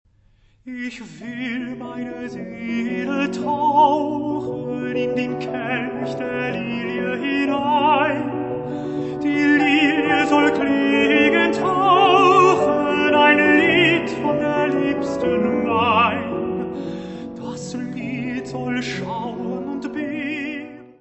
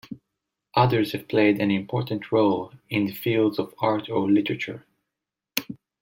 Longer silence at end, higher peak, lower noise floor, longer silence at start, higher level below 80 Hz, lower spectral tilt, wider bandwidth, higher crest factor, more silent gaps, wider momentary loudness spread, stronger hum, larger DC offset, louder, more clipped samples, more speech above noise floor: second, 0.1 s vs 0.25 s; first, 0 dBFS vs -4 dBFS; second, -56 dBFS vs -86 dBFS; first, 0.65 s vs 0.1 s; first, -54 dBFS vs -64 dBFS; about the same, -5.5 dB/octave vs -6.5 dB/octave; second, 8.4 kHz vs 16.5 kHz; about the same, 18 dB vs 22 dB; neither; first, 16 LU vs 10 LU; neither; neither; first, -19 LUFS vs -24 LUFS; neither; second, 35 dB vs 63 dB